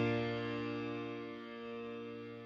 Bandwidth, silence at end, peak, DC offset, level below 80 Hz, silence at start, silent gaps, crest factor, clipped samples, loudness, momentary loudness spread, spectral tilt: 7.4 kHz; 0 s; -24 dBFS; under 0.1%; -70 dBFS; 0 s; none; 16 dB; under 0.1%; -41 LUFS; 9 LU; -7.5 dB/octave